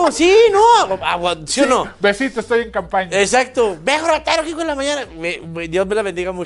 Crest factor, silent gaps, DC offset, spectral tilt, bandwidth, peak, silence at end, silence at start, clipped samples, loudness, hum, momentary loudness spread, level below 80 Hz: 14 dB; none; under 0.1%; -3 dB/octave; 11.5 kHz; -2 dBFS; 0 s; 0 s; under 0.1%; -16 LUFS; none; 11 LU; -44 dBFS